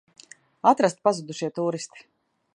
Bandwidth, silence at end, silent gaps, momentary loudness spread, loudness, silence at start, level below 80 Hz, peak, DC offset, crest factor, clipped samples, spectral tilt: 11 kHz; 0.55 s; none; 13 LU; -24 LUFS; 0.65 s; -76 dBFS; -4 dBFS; under 0.1%; 22 dB; under 0.1%; -5 dB/octave